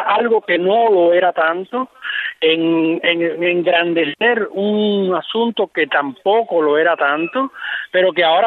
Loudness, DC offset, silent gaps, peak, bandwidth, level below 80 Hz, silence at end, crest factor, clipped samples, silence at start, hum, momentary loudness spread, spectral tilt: -16 LUFS; under 0.1%; none; -2 dBFS; 4.3 kHz; -72 dBFS; 0 s; 14 dB; under 0.1%; 0 s; none; 8 LU; -7.5 dB/octave